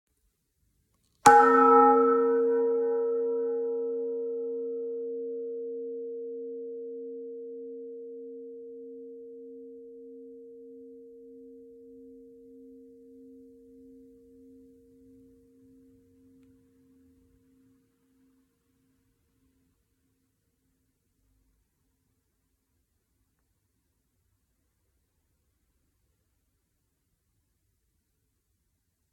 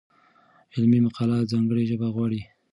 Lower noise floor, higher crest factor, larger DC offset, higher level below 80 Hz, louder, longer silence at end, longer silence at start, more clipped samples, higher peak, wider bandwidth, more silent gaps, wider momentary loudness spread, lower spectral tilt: first, -77 dBFS vs -59 dBFS; first, 30 dB vs 14 dB; neither; second, -74 dBFS vs -60 dBFS; about the same, -25 LUFS vs -24 LUFS; first, 16.45 s vs 0.3 s; first, 1.25 s vs 0.75 s; neither; first, -2 dBFS vs -10 dBFS; first, 13 kHz vs 6.6 kHz; neither; first, 29 LU vs 9 LU; second, -4 dB/octave vs -9 dB/octave